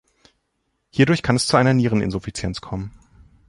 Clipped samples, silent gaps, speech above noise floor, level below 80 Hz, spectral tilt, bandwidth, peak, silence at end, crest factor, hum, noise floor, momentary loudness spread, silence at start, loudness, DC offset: under 0.1%; none; 53 dB; -44 dBFS; -5.5 dB/octave; 11.5 kHz; -2 dBFS; 0.6 s; 18 dB; none; -72 dBFS; 14 LU; 0.95 s; -20 LUFS; under 0.1%